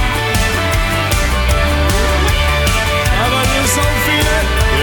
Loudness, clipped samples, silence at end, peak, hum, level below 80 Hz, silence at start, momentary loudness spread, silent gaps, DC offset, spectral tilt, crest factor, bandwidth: -14 LUFS; under 0.1%; 0 s; -2 dBFS; none; -18 dBFS; 0 s; 2 LU; none; under 0.1%; -4 dB/octave; 12 dB; over 20 kHz